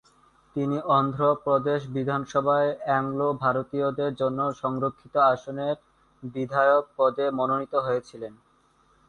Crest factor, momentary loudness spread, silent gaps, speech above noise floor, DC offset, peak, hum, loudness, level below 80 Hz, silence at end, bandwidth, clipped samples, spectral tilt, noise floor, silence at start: 18 dB; 9 LU; none; 38 dB; under 0.1%; -8 dBFS; none; -25 LUFS; -64 dBFS; 0.75 s; 9 kHz; under 0.1%; -7.5 dB/octave; -63 dBFS; 0.55 s